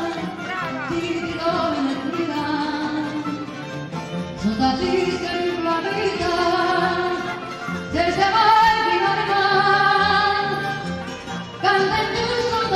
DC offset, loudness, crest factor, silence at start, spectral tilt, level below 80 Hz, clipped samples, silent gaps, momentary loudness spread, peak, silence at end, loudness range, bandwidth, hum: under 0.1%; -21 LUFS; 16 dB; 0 s; -5 dB/octave; -48 dBFS; under 0.1%; none; 13 LU; -6 dBFS; 0 s; 7 LU; 15 kHz; none